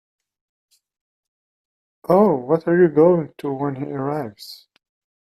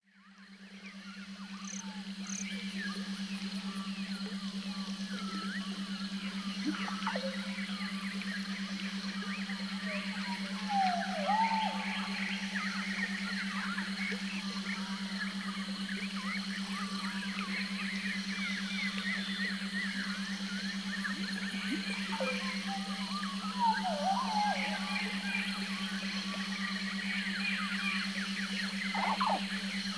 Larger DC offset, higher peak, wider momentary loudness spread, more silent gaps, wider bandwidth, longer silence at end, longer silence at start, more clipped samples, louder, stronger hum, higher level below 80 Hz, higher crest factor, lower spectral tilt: neither; first, -2 dBFS vs -20 dBFS; first, 19 LU vs 7 LU; neither; first, 13 kHz vs 11 kHz; first, 0.75 s vs 0 s; first, 2.1 s vs 0.15 s; neither; first, -19 LUFS vs -35 LUFS; neither; first, -64 dBFS vs -72 dBFS; about the same, 18 dB vs 18 dB; first, -8.5 dB/octave vs -4 dB/octave